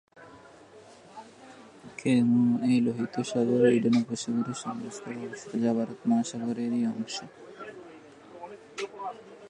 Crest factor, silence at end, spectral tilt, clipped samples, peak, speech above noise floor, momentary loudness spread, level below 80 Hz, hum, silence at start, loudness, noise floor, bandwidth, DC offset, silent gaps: 18 dB; 0 s; -6 dB/octave; under 0.1%; -10 dBFS; 25 dB; 24 LU; -74 dBFS; none; 0.15 s; -28 LUFS; -52 dBFS; 9.8 kHz; under 0.1%; none